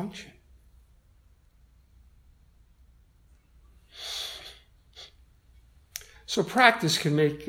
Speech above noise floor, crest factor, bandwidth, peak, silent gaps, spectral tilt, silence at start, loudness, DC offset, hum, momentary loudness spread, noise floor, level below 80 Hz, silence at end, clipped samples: 36 dB; 30 dB; 16.5 kHz; -2 dBFS; none; -4 dB/octave; 0 s; -25 LUFS; under 0.1%; none; 28 LU; -60 dBFS; -58 dBFS; 0 s; under 0.1%